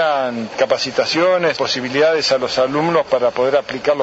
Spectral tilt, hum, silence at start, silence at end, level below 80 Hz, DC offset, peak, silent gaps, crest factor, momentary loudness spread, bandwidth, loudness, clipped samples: -4 dB/octave; none; 0 s; 0 s; -56 dBFS; under 0.1%; -2 dBFS; none; 14 dB; 5 LU; 8 kHz; -17 LUFS; under 0.1%